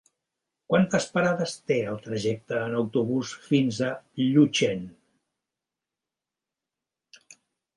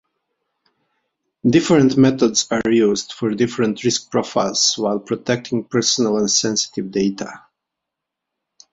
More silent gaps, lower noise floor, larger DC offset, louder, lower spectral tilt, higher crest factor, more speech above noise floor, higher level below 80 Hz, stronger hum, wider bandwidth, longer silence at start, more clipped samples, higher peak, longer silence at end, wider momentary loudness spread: neither; first, -89 dBFS vs -82 dBFS; neither; second, -26 LUFS vs -18 LUFS; first, -5.5 dB/octave vs -4 dB/octave; about the same, 20 dB vs 18 dB; about the same, 64 dB vs 64 dB; second, -66 dBFS vs -56 dBFS; neither; first, 11.5 kHz vs 7.8 kHz; second, 0.7 s vs 1.45 s; neither; second, -8 dBFS vs -2 dBFS; first, 2.85 s vs 1.35 s; about the same, 9 LU vs 8 LU